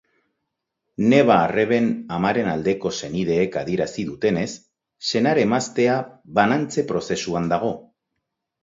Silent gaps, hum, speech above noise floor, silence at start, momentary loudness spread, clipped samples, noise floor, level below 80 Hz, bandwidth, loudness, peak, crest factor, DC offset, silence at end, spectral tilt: none; none; 59 dB; 1 s; 9 LU; under 0.1%; -79 dBFS; -54 dBFS; 7.8 kHz; -21 LUFS; -2 dBFS; 20 dB; under 0.1%; 0.85 s; -5.5 dB/octave